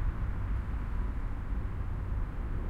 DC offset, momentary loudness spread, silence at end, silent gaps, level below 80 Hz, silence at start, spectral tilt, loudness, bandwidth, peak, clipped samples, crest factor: under 0.1%; 2 LU; 0 s; none; -34 dBFS; 0 s; -9 dB/octave; -37 LUFS; 4.4 kHz; -20 dBFS; under 0.1%; 12 dB